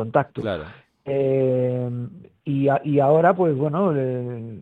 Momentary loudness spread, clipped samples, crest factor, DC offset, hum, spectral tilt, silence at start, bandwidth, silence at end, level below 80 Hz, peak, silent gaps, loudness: 15 LU; under 0.1%; 18 dB; under 0.1%; none; -10 dB/octave; 0 s; 4.5 kHz; 0 s; -58 dBFS; -2 dBFS; none; -21 LUFS